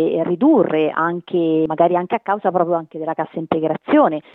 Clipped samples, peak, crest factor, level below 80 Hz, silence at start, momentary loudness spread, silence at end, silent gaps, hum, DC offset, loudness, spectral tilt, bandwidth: under 0.1%; -2 dBFS; 16 dB; -62 dBFS; 0 s; 8 LU; 0.15 s; none; none; under 0.1%; -18 LUFS; -10 dB/octave; 4 kHz